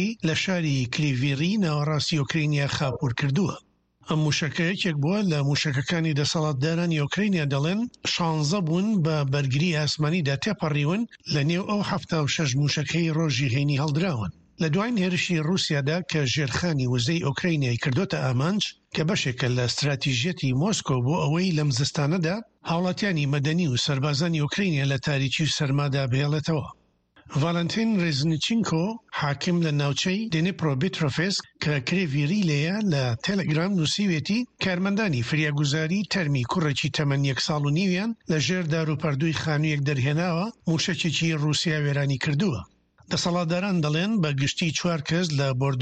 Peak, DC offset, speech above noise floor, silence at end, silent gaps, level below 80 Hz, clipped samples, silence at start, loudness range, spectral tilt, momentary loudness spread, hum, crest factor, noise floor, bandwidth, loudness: -10 dBFS; under 0.1%; 32 dB; 0 s; none; -56 dBFS; under 0.1%; 0 s; 1 LU; -5.5 dB/octave; 3 LU; none; 16 dB; -56 dBFS; 8.8 kHz; -25 LUFS